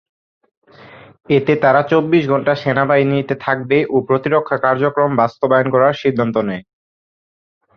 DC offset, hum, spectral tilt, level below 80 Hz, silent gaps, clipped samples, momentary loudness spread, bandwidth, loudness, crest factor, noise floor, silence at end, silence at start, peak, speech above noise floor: under 0.1%; none; -8.5 dB/octave; -56 dBFS; none; under 0.1%; 5 LU; 6.6 kHz; -15 LUFS; 14 dB; -41 dBFS; 1.15 s; 0.95 s; -2 dBFS; 26 dB